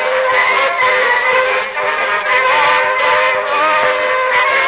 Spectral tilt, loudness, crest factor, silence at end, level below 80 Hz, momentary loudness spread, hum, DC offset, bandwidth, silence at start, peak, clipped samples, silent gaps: -4.5 dB/octave; -12 LUFS; 12 dB; 0 s; -56 dBFS; 4 LU; none; under 0.1%; 4 kHz; 0 s; 0 dBFS; under 0.1%; none